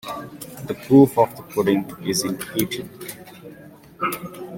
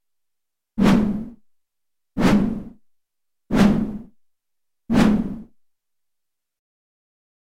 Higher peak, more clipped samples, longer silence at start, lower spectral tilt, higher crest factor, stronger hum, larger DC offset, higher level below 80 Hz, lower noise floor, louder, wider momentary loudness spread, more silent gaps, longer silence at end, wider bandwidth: about the same, -2 dBFS vs -2 dBFS; neither; second, 0.05 s vs 0.75 s; second, -5.5 dB/octave vs -7 dB/octave; about the same, 20 dB vs 22 dB; neither; neither; second, -58 dBFS vs -40 dBFS; second, -44 dBFS vs -83 dBFS; about the same, -21 LUFS vs -20 LUFS; first, 22 LU vs 17 LU; neither; second, 0 s vs 2.15 s; first, 17 kHz vs 14 kHz